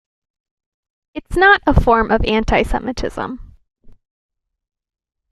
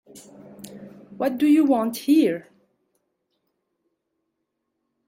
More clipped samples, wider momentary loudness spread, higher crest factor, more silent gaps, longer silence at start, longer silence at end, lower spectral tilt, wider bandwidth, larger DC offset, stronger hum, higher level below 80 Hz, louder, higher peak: neither; second, 19 LU vs 23 LU; about the same, 18 dB vs 16 dB; neither; first, 1.15 s vs 0.15 s; second, 1.4 s vs 2.65 s; about the same, -6 dB/octave vs -5.5 dB/octave; second, 13 kHz vs 16.5 kHz; neither; neither; first, -28 dBFS vs -72 dBFS; first, -15 LUFS vs -20 LUFS; first, -2 dBFS vs -8 dBFS